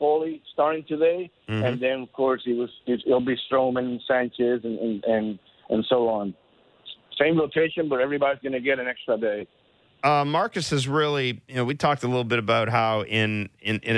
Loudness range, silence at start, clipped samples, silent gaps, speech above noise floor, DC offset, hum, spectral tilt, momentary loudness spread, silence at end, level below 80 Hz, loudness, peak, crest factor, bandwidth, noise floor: 2 LU; 0 s; under 0.1%; none; 23 dB; under 0.1%; none; -6 dB/octave; 6 LU; 0 s; -62 dBFS; -24 LUFS; -8 dBFS; 16 dB; 11 kHz; -47 dBFS